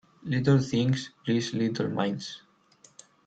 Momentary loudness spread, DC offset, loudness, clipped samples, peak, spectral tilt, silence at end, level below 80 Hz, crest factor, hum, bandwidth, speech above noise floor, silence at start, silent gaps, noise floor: 11 LU; under 0.1%; -28 LUFS; under 0.1%; -10 dBFS; -6.5 dB/octave; 0.9 s; -64 dBFS; 18 dB; none; 8.6 kHz; 33 dB; 0.25 s; none; -60 dBFS